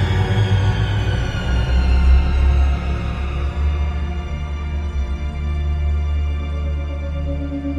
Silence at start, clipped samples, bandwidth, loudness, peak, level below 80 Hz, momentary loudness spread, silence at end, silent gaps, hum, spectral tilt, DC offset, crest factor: 0 s; under 0.1%; 7.4 kHz; -21 LUFS; -4 dBFS; -20 dBFS; 8 LU; 0 s; none; none; -7 dB/octave; under 0.1%; 14 dB